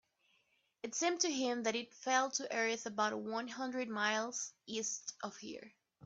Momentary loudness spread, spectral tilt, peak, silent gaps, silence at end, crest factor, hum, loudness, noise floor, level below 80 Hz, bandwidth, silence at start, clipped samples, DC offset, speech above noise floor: 12 LU; -1.5 dB/octave; -20 dBFS; none; 0 s; 20 dB; none; -37 LUFS; -77 dBFS; -86 dBFS; 8.4 kHz; 0.85 s; under 0.1%; under 0.1%; 39 dB